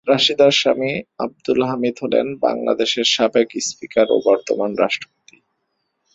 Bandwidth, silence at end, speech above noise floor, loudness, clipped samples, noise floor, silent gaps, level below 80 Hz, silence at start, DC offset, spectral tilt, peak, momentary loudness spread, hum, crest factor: 8.2 kHz; 1.1 s; 54 dB; -18 LUFS; under 0.1%; -72 dBFS; none; -60 dBFS; 0.05 s; under 0.1%; -3.5 dB/octave; 0 dBFS; 10 LU; none; 18 dB